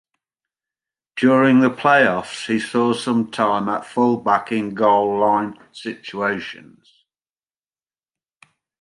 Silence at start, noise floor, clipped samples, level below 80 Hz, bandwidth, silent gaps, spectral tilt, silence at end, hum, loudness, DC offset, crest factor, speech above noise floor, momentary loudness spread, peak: 1.15 s; under -90 dBFS; under 0.1%; -64 dBFS; 11 kHz; none; -6 dB/octave; 2.25 s; none; -18 LUFS; under 0.1%; 18 dB; over 72 dB; 15 LU; -2 dBFS